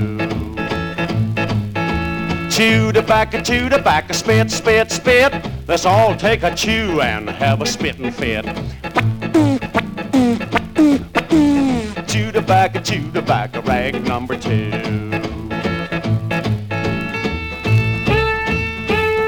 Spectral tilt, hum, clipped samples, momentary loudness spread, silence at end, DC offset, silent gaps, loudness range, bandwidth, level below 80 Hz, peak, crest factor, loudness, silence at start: -5.5 dB/octave; none; under 0.1%; 8 LU; 0 s; 0.2%; none; 5 LU; 19 kHz; -34 dBFS; -2 dBFS; 16 dB; -17 LUFS; 0 s